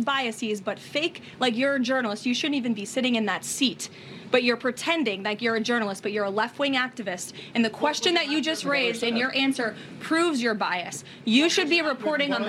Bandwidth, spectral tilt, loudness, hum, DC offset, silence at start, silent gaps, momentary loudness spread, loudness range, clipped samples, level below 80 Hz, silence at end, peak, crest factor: 15 kHz; -3 dB/octave; -25 LUFS; none; under 0.1%; 0 s; none; 8 LU; 2 LU; under 0.1%; -76 dBFS; 0 s; -6 dBFS; 20 dB